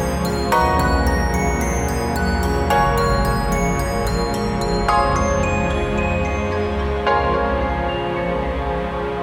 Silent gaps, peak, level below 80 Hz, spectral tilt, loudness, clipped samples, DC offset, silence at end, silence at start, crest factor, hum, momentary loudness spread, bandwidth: none; -4 dBFS; -26 dBFS; -5.5 dB/octave; -19 LUFS; under 0.1%; under 0.1%; 0 s; 0 s; 14 dB; none; 5 LU; 16.5 kHz